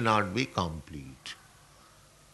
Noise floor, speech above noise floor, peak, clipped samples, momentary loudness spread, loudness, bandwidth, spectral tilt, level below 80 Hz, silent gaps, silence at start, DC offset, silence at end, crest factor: -58 dBFS; 27 dB; -8 dBFS; under 0.1%; 18 LU; -32 LUFS; 12 kHz; -5 dB/octave; -56 dBFS; none; 0 s; under 0.1%; 1 s; 24 dB